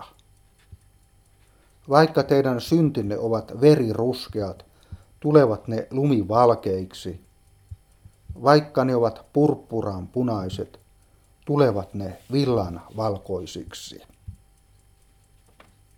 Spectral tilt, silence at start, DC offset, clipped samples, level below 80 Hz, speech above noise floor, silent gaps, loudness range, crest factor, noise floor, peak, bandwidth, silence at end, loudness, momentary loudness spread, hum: -7.5 dB/octave; 0 s; under 0.1%; under 0.1%; -52 dBFS; 36 dB; none; 6 LU; 22 dB; -58 dBFS; 0 dBFS; 16 kHz; 1.65 s; -22 LUFS; 18 LU; none